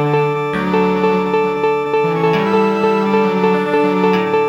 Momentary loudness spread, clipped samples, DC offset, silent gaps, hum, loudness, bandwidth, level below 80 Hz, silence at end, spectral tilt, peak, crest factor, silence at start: 2 LU; under 0.1%; under 0.1%; none; none; -15 LUFS; 8.2 kHz; -50 dBFS; 0 s; -7.5 dB/octave; -2 dBFS; 12 dB; 0 s